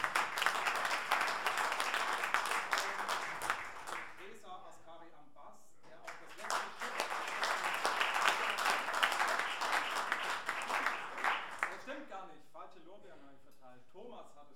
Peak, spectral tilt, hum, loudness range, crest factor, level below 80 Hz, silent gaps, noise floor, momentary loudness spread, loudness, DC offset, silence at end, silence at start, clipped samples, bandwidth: -12 dBFS; 0 dB/octave; none; 11 LU; 26 dB; -80 dBFS; none; -62 dBFS; 20 LU; -35 LUFS; 0.3%; 0.1 s; 0 s; under 0.1%; 19 kHz